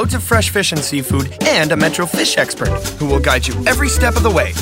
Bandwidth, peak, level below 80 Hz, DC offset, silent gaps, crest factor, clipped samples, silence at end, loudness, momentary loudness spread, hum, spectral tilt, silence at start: 16.5 kHz; 0 dBFS; -24 dBFS; under 0.1%; none; 14 dB; under 0.1%; 0 s; -15 LUFS; 5 LU; none; -4 dB/octave; 0 s